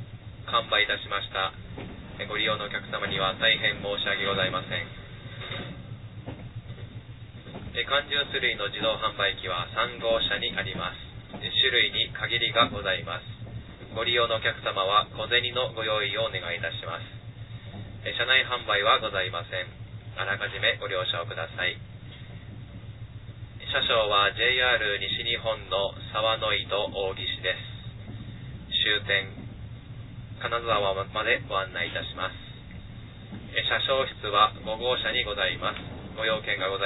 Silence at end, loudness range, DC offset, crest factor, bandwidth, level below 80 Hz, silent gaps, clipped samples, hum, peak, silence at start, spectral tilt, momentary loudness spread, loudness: 0 s; 5 LU; under 0.1%; 22 dB; 4.1 kHz; -50 dBFS; none; under 0.1%; none; -6 dBFS; 0 s; -6 dB/octave; 20 LU; -26 LUFS